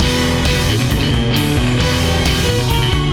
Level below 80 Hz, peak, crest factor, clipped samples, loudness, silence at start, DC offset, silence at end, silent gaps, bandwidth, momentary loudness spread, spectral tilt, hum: -22 dBFS; -2 dBFS; 12 dB; under 0.1%; -15 LUFS; 0 s; under 0.1%; 0 s; none; 19 kHz; 1 LU; -4.5 dB/octave; none